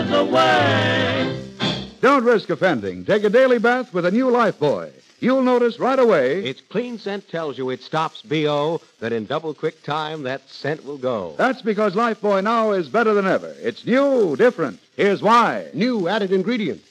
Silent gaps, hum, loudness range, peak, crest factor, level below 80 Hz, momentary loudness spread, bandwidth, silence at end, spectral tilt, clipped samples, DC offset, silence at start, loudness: none; none; 6 LU; -4 dBFS; 16 dB; -62 dBFS; 12 LU; 10.5 kHz; 0.15 s; -6 dB/octave; under 0.1%; under 0.1%; 0 s; -20 LUFS